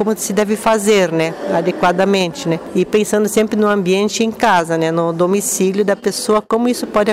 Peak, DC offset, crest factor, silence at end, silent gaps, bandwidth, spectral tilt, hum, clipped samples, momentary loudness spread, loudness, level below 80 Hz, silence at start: -4 dBFS; 0.1%; 10 dB; 0 s; none; 16 kHz; -4.5 dB/octave; none; under 0.1%; 4 LU; -15 LUFS; -52 dBFS; 0 s